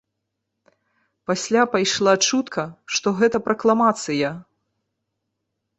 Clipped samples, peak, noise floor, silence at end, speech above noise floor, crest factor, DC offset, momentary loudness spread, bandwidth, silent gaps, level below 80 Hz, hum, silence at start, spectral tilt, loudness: under 0.1%; -4 dBFS; -79 dBFS; 1.35 s; 59 dB; 20 dB; under 0.1%; 10 LU; 8.4 kHz; none; -64 dBFS; none; 1.3 s; -3.5 dB/octave; -20 LUFS